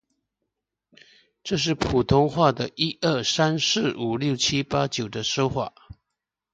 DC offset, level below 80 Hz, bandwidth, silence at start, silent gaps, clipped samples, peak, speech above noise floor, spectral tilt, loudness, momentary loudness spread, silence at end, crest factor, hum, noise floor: under 0.1%; -48 dBFS; 9.2 kHz; 1.45 s; none; under 0.1%; -4 dBFS; 61 dB; -4.5 dB/octave; -23 LUFS; 6 LU; 0.85 s; 20 dB; none; -84 dBFS